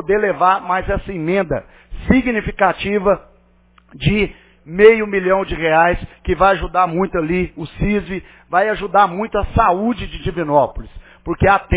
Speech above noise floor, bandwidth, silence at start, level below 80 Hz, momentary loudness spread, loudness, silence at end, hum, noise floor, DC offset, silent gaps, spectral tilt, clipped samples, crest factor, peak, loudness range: 36 dB; 4 kHz; 0 s; -32 dBFS; 10 LU; -17 LUFS; 0 s; none; -52 dBFS; under 0.1%; none; -10 dB/octave; under 0.1%; 16 dB; 0 dBFS; 4 LU